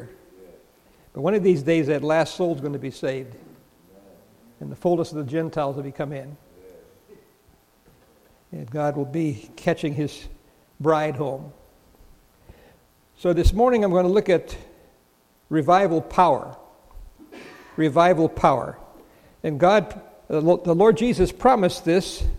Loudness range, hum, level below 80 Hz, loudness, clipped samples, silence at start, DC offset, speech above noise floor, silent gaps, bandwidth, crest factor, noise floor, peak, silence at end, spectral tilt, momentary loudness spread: 9 LU; none; -38 dBFS; -22 LUFS; under 0.1%; 0 s; under 0.1%; 39 dB; none; 15.5 kHz; 22 dB; -60 dBFS; -2 dBFS; 0 s; -6.5 dB/octave; 19 LU